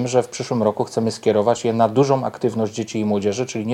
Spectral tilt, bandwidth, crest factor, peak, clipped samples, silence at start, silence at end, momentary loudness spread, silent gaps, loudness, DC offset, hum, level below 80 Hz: -6 dB/octave; 13 kHz; 18 dB; -2 dBFS; under 0.1%; 0 s; 0 s; 6 LU; none; -20 LUFS; under 0.1%; none; -62 dBFS